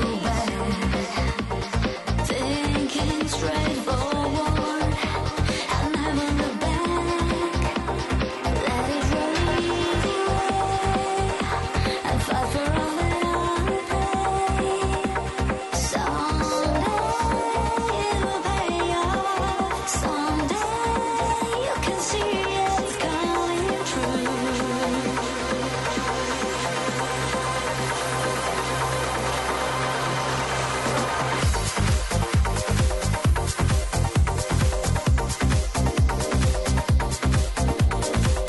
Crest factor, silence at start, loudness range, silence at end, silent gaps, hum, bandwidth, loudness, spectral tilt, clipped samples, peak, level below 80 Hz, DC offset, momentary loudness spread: 12 dB; 0 s; 2 LU; 0 s; none; none; 12 kHz; -24 LUFS; -4.5 dB/octave; under 0.1%; -10 dBFS; -30 dBFS; under 0.1%; 2 LU